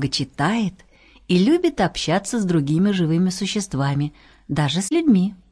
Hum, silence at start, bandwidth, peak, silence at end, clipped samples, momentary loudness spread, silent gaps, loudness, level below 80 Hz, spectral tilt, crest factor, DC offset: none; 0 s; 11 kHz; -4 dBFS; 0.15 s; under 0.1%; 7 LU; none; -20 LUFS; -48 dBFS; -5.5 dB/octave; 16 dB; under 0.1%